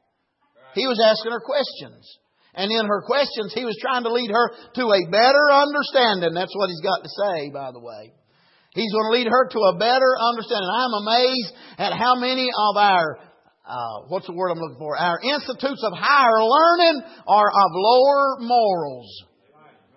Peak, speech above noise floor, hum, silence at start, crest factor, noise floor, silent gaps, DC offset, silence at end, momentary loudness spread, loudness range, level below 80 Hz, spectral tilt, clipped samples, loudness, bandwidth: -4 dBFS; 49 dB; none; 0.75 s; 16 dB; -69 dBFS; none; under 0.1%; 0.75 s; 14 LU; 6 LU; -74 dBFS; -7 dB/octave; under 0.1%; -19 LUFS; 6 kHz